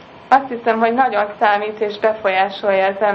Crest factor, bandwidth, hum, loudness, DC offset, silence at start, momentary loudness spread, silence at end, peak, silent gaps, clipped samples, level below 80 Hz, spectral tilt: 16 dB; 6.8 kHz; none; -17 LUFS; under 0.1%; 0 s; 4 LU; 0 s; 0 dBFS; none; under 0.1%; -62 dBFS; -6 dB/octave